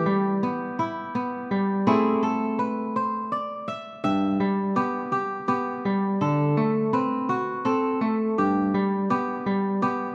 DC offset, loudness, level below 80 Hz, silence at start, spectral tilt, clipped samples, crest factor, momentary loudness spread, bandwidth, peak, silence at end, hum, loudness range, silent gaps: under 0.1%; -25 LUFS; -66 dBFS; 0 s; -8.5 dB/octave; under 0.1%; 16 dB; 6 LU; 7.2 kHz; -8 dBFS; 0 s; none; 2 LU; none